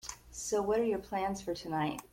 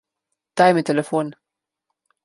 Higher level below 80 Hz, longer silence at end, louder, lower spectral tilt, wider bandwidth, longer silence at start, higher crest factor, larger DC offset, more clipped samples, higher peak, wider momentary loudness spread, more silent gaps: first, -58 dBFS vs -68 dBFS; second, 0.05 s vs 0.95 s; second, -34 LUFS vs -19 LUFS; second, -4.5 dB/octave vs -6 dB/octave; first, 16.5 kHz vs 11.5 kHz; second, 0.05 s vs 0.55 s; second, 14 dB vs 20 dB; neither; neither; second, -20 dBFS vs -2 dBFS; second, 8 LU vs 15 LU; neither